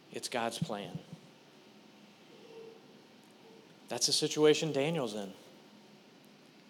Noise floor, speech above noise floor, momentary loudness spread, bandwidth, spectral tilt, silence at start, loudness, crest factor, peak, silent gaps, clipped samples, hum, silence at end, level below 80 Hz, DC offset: -59 dBFS; 27 dB; 26 LU; 17 kHz; -3.5 dB/octave; 0.1 s; -32 LUFS; 22 dB; -14 dBFS; none; under 0.1%; none; 1.1 s; -86 dBFS; under 0.1%